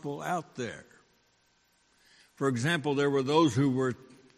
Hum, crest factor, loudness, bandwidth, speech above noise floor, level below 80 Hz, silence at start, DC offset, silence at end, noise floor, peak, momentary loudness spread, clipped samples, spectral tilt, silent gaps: none; 20 dB; -29 LUFS; 13.5 kHz; 41 dB; -70 dBFS; 0.05 s; under 0.1%; 0.4 s; -69 dBFS; -12 dBFS; 14 LU; under 0.1%; -6 dB/octave; none